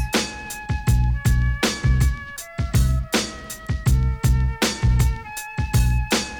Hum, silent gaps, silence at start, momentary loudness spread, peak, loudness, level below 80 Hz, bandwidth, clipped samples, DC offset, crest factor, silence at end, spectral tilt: none; none; 0 s; 9 LU; -6 dBFS; -22 LUFS; -24 dBFS; 19.5 kHz; under 0.1%; under 0.1%; 14 dB; 0 s; -4.5 dB/octave